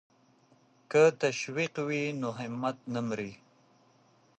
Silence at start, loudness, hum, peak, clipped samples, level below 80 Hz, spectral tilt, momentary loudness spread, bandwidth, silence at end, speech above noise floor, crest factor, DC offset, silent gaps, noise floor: 0.9 s; -30 LUFS; none; -12 dBFS; under 0.1%; -76 dBFS; -5 dB/octave; 11 LU; 8.8 kHz; 1.05 s; 35 dB; 20 dB; under 0.1%; none; -65 dBFS